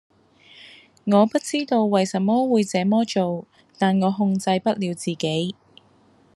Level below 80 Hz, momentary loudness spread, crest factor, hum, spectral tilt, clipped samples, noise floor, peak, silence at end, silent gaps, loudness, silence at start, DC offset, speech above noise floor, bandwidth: -70 dBFS; 8 LU; 18 dB; none; -6 dB/octave; under 0.1%; -57 dBFS; -4 dBFS; 0.85 s; none; -22 LUFS; 0.65 s; under 0.1%; 36 dB; 12 kHz